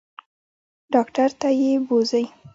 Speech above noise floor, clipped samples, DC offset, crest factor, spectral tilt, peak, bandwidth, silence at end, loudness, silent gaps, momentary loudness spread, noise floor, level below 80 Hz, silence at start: over 70 dB; under 0.1%; under 0.1%; 18 dB; -5 dB/octave; -4 dBFS; 7.8 kHz; 0.05 s; -21 LUFS; none; 3 LU; under -90 dBFS; -70 dBFS; 0.9 s